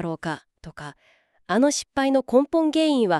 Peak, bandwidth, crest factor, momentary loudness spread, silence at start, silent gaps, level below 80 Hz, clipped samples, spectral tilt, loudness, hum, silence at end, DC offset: -6 dBFS; 12.5 kHz; 16 dB; 19 LU; 0 s; none; -58 dBFS; under 0.1%; -4.5 dB/octave; -22 LUFS; none; 0 s; under 0.1%